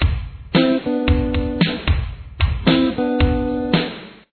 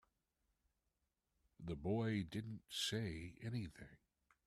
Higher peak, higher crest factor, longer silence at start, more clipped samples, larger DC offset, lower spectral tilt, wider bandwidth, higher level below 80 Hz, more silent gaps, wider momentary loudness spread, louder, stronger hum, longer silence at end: first, -2 dBFS vs -28 dBFS; about the same, 16 dB vs 18 dB; second, 0 s vs 1.6 s; neither; neither; first, -9.5 dB/octave vs -5 dB/octave; second, 4.6 kHz vs 14.5 kHz; first, -26 dBFS vs -68 dBFS; neither; second, 7 LU vs 14 LU; first, -19 LUFS vs -44 LUFS; neither; second, 0.2 s vs 0.5 s